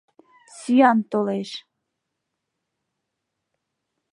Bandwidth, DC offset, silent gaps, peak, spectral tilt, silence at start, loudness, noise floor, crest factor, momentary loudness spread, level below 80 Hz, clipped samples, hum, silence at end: 11 kHz; under 0.1%; none; -4 dBFS; -5.5 dB/octave; 0.55 s; -20 LUFS; -80 dBFS; 22 dB; 19 LU; -80 dBFS; under 0.1%; none; 2.55 s